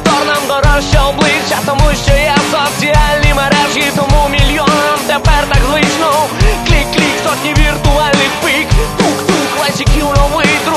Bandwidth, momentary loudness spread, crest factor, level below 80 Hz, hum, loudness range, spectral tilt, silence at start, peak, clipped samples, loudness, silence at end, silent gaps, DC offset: 13.5 kHz; 3 LU; 10 dB; -16 dBFS; none; 1 LU; -4 dB/octave; 0 s; 0 dBFS; 0.2%; -11 LUFS; 0 s; none; under 0.1%